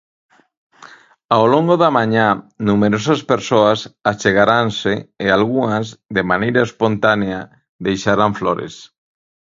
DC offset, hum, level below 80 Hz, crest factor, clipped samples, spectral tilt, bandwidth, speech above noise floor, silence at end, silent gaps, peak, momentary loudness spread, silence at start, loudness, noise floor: under 0.1%; none; -50 dBFS; 16 dB; under 0.1%; -6 dB/octave; 7.6 kHz; 28 dB; 0.7 s; 7.69-7.79 s; 0 dBFS; 8 LU; 1.3 s; -16 LUFS; -43 dBFS